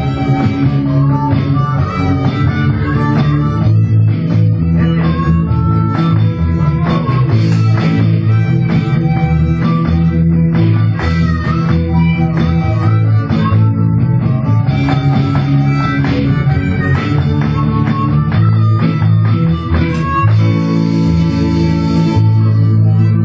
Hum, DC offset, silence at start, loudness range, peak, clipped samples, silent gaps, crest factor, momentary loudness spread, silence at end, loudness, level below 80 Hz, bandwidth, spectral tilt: none; under 0.1%; 0 s; 1 LU; 0 dBFS; under 0.1%; none; 12 dB; 3 LU; 0 s; -12 LUFS; -24 dBFS; 7 kHz; -9 dB/octave